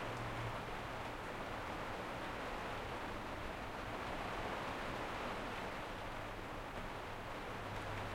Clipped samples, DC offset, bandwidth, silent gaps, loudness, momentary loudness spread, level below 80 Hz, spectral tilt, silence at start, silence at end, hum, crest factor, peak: under 0.1%; under 0.1%; 16.5 kHz; none; -45 LUFS; 4 LU; -54 dBFS; -5 dB/octave; 0 s; 0 s; none; 14 dB; -30 dBFS